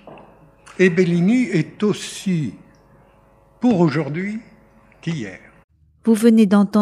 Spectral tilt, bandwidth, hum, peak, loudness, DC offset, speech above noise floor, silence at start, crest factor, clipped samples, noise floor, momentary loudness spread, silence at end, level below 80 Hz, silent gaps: -7 dB/octave; 14 kHz; none; -2 dBFS; -18 LUFS; under 0.1%; 36 dB; 0.05 s; 18 dB; under 0.1%; -53 dBFS; 15 LU; 0 s; -60 dBFS; 5.64-5.68 s